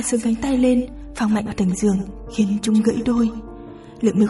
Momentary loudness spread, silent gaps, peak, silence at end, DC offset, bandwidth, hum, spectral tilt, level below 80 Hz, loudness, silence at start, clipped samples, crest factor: 14 LU; none; -4 dBFS; 0 s; under 0.1%; 11.5 kHz; none; -6 dB/octave; -40 dBFS; -20 LUFS; 0 s; under 0.1%; 16 dB